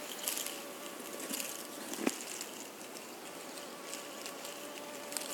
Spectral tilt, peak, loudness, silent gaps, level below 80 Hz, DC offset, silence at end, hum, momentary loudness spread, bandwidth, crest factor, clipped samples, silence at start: -1 dB/octave; -10 dBFS; -41 LUFS; none; -90 dBFS; under 0.1%; 0 s; none; 9 LU; 18 kHz; 34 dB; under 0.1%; 0 s